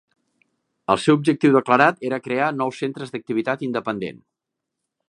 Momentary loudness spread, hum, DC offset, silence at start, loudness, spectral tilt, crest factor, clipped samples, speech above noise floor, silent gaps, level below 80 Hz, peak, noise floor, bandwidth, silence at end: 12 LU; none; under 0.1%; 0.9 s; -20 LUFS; -6 dB/octave; 22 dB; under 0.1%; 62 dB; none; -64 dBFS; 0 dBFS; -82 dBFS; 11 kHz; 0.95 s